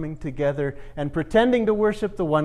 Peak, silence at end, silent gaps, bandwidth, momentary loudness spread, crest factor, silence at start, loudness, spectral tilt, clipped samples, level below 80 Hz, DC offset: -6 dBFS; 0 s; none; 11.5 kHz; 10 LU; 16 dB; 0 s; -23 LUFS; -7.5 dB/octave; under 0.1%; -42 dBFS; under 0.1%